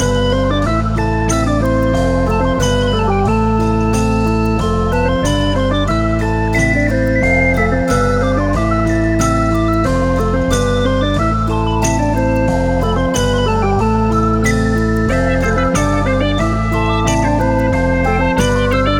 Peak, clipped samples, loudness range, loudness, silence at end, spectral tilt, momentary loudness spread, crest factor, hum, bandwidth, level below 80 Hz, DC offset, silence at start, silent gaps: 0 dBFS; under 0.1%; 1 LU; -15 LUFS; 0 s; -6 dB/octave; 2 LU; 12 dB; none; 16.5 kHz; -22 dBFS; under 0.1%; 0 s; none